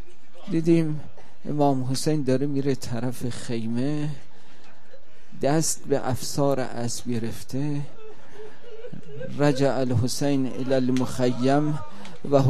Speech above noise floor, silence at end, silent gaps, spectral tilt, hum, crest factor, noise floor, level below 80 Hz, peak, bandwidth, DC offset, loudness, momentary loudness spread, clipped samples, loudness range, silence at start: 29 dB; 0 s; none; -6 dB/octave; none; 20 dB; -53 dBFS; -54 dBFS; -4 dBFS; 14.5 kHz; 5%; -25 LUFS; 19 LU; under 0.1%; 5 LU; 0.35 s